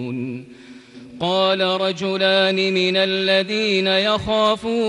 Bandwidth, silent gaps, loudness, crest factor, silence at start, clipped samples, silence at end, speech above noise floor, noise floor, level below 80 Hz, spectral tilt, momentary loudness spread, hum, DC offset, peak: 11 kHz; none; -18 LUFS; 14 dB; 0 s; under 0.1%; 0 s; 20 dB; -40 dBFS; -52 dBFS; -4.5 dB/octave; 10 LU; none; under 0.1%; -4 dBFS